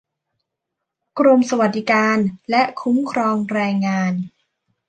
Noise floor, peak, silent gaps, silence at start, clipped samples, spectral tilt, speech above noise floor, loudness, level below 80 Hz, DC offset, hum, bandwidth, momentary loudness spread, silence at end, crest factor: -80 dBFS; -2 dBFS; none; 1.15 s; under 0.1%; -6 dB/octave; 63 dB; -18 LUFS; -66 dBFS; under 0.1%; none; 9 kHz; 7 LU; 0.6 s; 16 dB